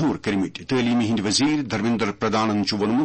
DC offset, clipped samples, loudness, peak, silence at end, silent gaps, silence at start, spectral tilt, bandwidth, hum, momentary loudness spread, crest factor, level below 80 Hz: under 0.1%; under 0.1%; -22 LUFS; -8 dBFS; 0 s; none; 0 s; -4.5 dB/octave; 8.8 kHz; none; 4 LU; 14 dB; -54 dBFS